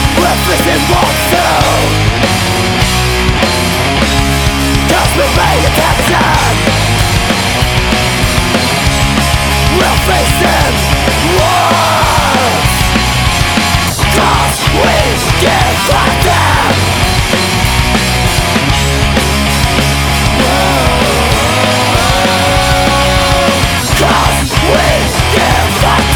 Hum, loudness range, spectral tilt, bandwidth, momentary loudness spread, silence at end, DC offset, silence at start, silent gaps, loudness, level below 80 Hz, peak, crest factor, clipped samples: none; 1 LU; -4 dB/octave; 19.5 kHz; 2 LU; 0 s; under 0.1%; 0 s; none; -9 LUFS; -18 dBFS; 0 dBFS; 10 dB; under 0.1%